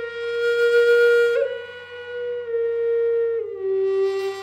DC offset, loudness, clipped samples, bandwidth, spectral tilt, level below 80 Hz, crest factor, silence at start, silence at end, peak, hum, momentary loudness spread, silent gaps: under 0.1%; -21 LUFS; under 0.1%; 12.5 kHz; -3.5 dB/octave; -72 dBFS; 12 dB; 0 s; 0 s; -8 dBFS; none; 15 LU; none